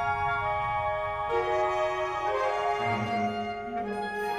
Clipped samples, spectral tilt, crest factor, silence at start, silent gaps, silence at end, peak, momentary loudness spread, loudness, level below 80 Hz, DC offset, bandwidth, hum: under 0.1%; -5.5 dB/octave; 12 dB; 0 s; none; 0 s; -16 dBFS; 5 LU; -29 LUFS; -52 dBFS; under 0.1%; 17 kHz; none